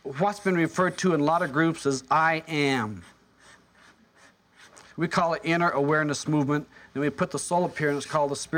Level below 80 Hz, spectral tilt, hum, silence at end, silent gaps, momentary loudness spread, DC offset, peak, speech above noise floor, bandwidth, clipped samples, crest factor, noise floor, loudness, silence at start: -64 dBFS; -5 dB/octave; none; 0 s; none; 7 LU; under 0.1%; -10 dBFS; 33 dB; 16 kHz; under 0.1%; 16 dB; -58 dBFS; -25 LUFS; 0.05 s